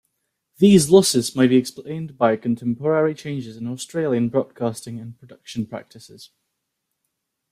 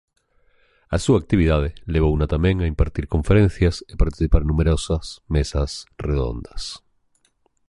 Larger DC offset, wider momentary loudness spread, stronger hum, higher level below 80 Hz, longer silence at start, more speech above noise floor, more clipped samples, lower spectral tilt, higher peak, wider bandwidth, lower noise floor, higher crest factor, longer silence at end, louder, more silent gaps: neither; first, 18 LU vs 10 LU; neither; second, -58 dBFS vs -26 dBFS; second, 0.6 s vs 0.9 s; first, 58 dB vs 45 dB; neither; second, -5.5 dB/octave vs -7 dB/octave; about the same, -2 dBFS vs -2 dBFS; first, 15.5 kHz vs 11.5 kHz; first, -78 dBFS vs -65 dBFS; about the same, 20 dB vs 18 dB; first, 1.25 s vs 0.9 s; about the same, -19 LUFS vs -21 LUFS; neither